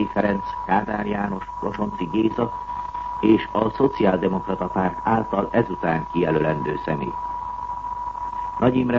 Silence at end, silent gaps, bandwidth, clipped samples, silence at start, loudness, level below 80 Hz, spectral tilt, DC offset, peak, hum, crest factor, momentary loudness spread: 0 s; none; 7.2 kHz; under 0.1%; 0 s; -23 LUFS; -44 dBFS; -8.5 dB/octave; under 0.1%; -4 dBFS; none; 18 dB; 10 LU